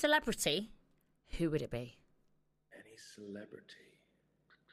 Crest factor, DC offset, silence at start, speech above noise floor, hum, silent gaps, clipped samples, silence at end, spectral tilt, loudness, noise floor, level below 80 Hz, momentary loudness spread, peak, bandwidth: 22 dB; under 0.1%; 0 s; 38 dB; none; none; under 0.1%; 0.95 s; -3.5 dB/octave; -37 LUFS; -76 dBFS; -58 dBFS; 25 LU; -18 dBFS; 15 kHz